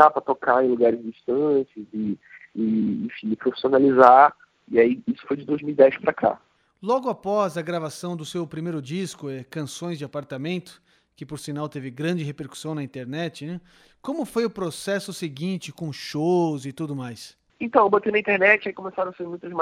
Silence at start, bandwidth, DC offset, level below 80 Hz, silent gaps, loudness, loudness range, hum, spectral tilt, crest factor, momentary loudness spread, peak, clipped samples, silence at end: 0 s; 15 kHz; under 0.1%; -66 dBFS; none; -23 LUFS; 13 LU; none; -6 dB/octave; 22 dB; 15 LU; 0 dBFS; under 0.1%; 0 s